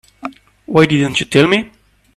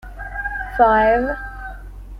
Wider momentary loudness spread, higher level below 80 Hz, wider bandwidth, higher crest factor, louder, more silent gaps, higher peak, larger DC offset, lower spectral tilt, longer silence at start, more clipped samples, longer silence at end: about the same, 19 LU vs 20 LU; second, -48 dBFS vs -34 dBFS; first, 13.5 kHz vs 12 kHz; about the same, 16 dB vs 18 dB; first, -13 LUFS vs -18 LUFS; neither; about the same, 0 dBFS vs -2 dBFS; neither; second, -5.5 dB/octave vs -7 dB/octave; first, 0.25 s vs 0.05 s; neither; first, 0.5 s vs 0 s